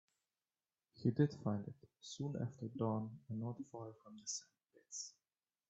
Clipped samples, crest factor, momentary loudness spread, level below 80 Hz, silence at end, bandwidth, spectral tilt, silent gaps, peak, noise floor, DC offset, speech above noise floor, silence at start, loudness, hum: under 0.1%; 22 dB; 15 LU; -80 dBFS; 0.6 s; 8.2 kHz; -6 dB/octave; none; -22 dBFS; under -90 dBFS; under 0.1%; over 48 dB; 0.95 s; -43 LUFS; none